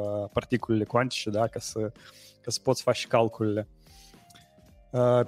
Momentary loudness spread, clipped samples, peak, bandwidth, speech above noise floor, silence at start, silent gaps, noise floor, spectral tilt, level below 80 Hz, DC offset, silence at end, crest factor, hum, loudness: 9 LU; under 0.1%; -8 dBFS; 16 kHz; 29 dB; 0 s; none; -56 dBFS; -5.5 dB/octave; -58 dBFS; under 0.1%; 0 s; 20 dB; none; -28 LUFS